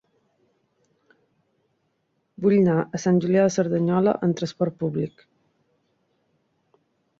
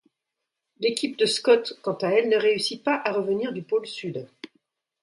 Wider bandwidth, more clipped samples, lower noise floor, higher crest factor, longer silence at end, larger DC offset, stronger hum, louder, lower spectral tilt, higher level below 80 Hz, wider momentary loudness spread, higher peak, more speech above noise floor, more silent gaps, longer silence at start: second, 7.6 kHz vs 11.5 kHz; neither; second, -72 dBFS vs -84 dBFS; about the same, 18 dB vs 18 dB; first, 2.1 s vs 0.55 s; neither; neither; about the same, -22 LUFS vs -24 LUFS; first, -7 dB/octave vs -4 dB/octave; first, -64 dBFS vs -76 dBFS; second, 8 LU vs 12 LU; about the same, -8 dBFS vs -6 dBFS; second, 51 dB vs 60 dB; neither; first, 2.4 s vs 0.8 s